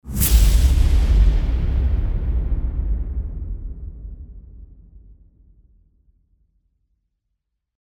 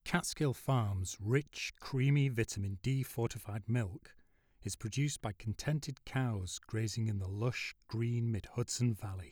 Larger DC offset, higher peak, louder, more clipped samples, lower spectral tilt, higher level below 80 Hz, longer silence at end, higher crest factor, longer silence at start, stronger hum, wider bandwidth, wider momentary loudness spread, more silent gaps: neither; first, -4 dBFS vs -18 dBFS; first, -21 LUFS vs -37 LUFS; neither; about the same, -5 dB/octave vs -5.5 dB/octave; first, -20 dBFS vs -60 dBFS; first, 2.85 s vs 0 s; about the same, 18 dB vs 18 dB; about the same, 0.05 s vs 0.05 s; neither; about the same, over 20 kHz vs 19 kHz; first, 20 LU vs 8 LU; neither